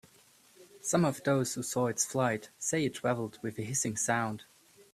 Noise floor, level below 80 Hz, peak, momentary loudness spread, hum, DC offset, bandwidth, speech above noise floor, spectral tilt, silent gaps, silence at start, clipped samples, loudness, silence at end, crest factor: -62 dBFS; -70 dBFS; -14 dBFS; 9 LU; none; under 0.1%; 15.5 kHz; 31 dB; -4.5 dB/octave; none; 0.6 s; under 0.1%; -32 LUFS; 0.5 s; 20 dB